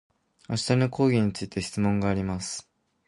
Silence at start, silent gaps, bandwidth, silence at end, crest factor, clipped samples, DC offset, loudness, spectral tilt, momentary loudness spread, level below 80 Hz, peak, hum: 0.5 s; none; 11.5 kHz; 0.45 s; 18 dB; under 0.1%; under 0.1%; -26 LUFS; -6 dB/octave; 10 LU; -50 dBFS; -8 dBFS; none